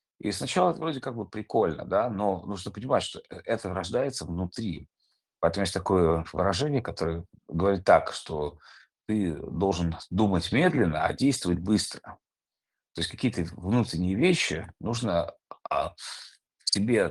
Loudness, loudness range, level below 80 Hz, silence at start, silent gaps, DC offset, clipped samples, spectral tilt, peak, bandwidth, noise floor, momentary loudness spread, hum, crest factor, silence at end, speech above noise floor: -28 LUFS; 3 LU; -54 dBFS; 0.25 s; none; under 0.1%; under 0.1%; -5.5 dB/octave; -6 dBFS; 12.5 kHz; under -90 dBFS; 12 LU; none; 22 dB; 0 s; over 63 dB